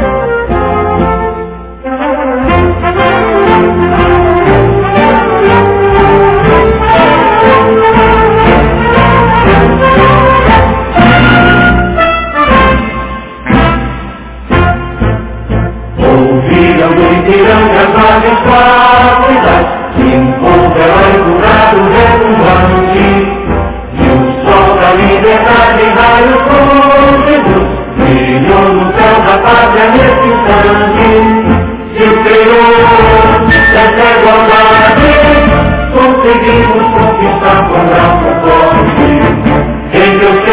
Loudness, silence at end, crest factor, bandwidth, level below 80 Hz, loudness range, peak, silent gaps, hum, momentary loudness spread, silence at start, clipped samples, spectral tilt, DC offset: -6 LUFS; 0 s; 6 dB; 4 kHz; -18 dBFS; 5 LU; 0 dBFS; none; none; 7 LU; 0 s; 5%; -10 dB/octave; under 0.1%